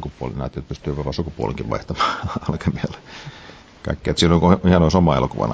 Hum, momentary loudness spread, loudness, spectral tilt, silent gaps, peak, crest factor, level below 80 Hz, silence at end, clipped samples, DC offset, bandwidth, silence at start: none; 19 LU; -20 LUFS; -6.5 dB/octave; none; -2 dBFS; 18 dB; -32 dBFS; 0 s; under 0.1%; under 0.1%; 8 kHz; 0 s